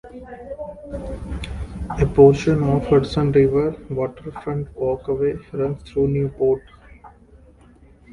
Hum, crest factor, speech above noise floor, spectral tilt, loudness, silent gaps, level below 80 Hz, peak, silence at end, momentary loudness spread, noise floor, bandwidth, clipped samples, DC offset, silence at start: none; 20 dB; 31 dB; -8.5 dB/octave; -20 LUFS; none; -36 dBFS; 0 dBFS; 0 s; 19 LU; -49 dBFS; 11 kHz; under 0.1%; under 0.1%; 0.05 s